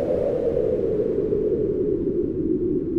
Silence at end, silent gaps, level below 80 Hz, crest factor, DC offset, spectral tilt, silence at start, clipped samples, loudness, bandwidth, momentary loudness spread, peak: 0 s; none; -40 dBFS; 12 dB; 0.2%; -11 dB/octave; 0 s; under 0.1%; -23 LUFS; 5.2 kHz; 1 LU; -12 dBFS